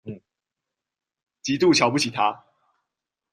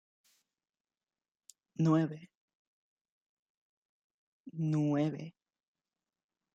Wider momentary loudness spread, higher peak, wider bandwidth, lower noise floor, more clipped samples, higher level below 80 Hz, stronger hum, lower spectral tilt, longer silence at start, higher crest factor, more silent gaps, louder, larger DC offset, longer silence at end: about the same, 20 LU vs 19 LU; first, -4 dBFS vs -18 dBFS; first, 13 kHz vs 8.8 kHz; second, -86 dBFS vs under -90 dBFS; neither; first, -64 dBFS vs -82 dBFS; neither; second, -4 dB/octave vs -8.5 dB/octave; second, 0.05 s vs 1.8 s; about the same, 22 dB vs 20 dB; second, none vs 2.37-2.48 s, 2.55-3.05 s, 3.12-4.44 s; first, -21 LUFS vs -32 LUFS; neither; second, 0.95 s vs 1.25 s